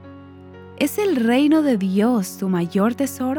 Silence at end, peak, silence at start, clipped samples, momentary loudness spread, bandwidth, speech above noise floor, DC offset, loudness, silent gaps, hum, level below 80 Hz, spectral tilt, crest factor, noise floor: 0 s; -6 dBFS; 0 s; under 0.1%; 7 LU; over 20 kHz; 22 dB; under 0.1%; -19 LUFS; none; none; -66 dBFS; -6 dB/octave; 14 dB; -41 dBFS